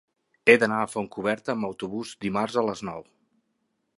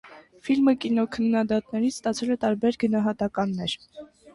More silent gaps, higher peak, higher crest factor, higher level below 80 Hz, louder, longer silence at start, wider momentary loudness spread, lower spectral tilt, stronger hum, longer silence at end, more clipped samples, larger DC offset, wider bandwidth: neither; first, -2 dBFS vs -10 dBFS; first, 24 dB vs 14 dB; second, -66 dBFS vs -60 dBFS; about the same, -25 LUFS vs -25 LUFS; first, 0.45 s vs 0.05 s; first, 15 LU vs 7 LU; about the same, -5 dB/octave vs -5.5 dB/octave; neither; first, 0.95 s vs 0.05 s; neither; neither; about the same, 11.5 kHz vs 11.5 kHz